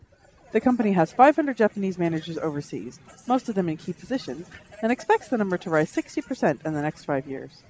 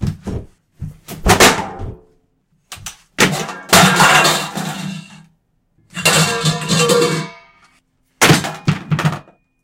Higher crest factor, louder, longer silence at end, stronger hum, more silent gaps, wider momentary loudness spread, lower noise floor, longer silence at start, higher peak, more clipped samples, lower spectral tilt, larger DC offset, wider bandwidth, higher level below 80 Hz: first, 22 dB vs 16 dB; second, -25 LUFS vs -13 LUFS; second, 0.2 s vs 0.45 s; neither; neither; second, 16 LU vs 22 LU; second, -54 dBFS vs -61 dBFS; first, 0.55 s vs 0 s; second, -4 dBFS vs 0 dBFS; neither; first, -7 dB/octave vs -3 dB/octave; neither; second, 8 kHz vs 17 kHz; second, -60 dBFS vs -36 dBFS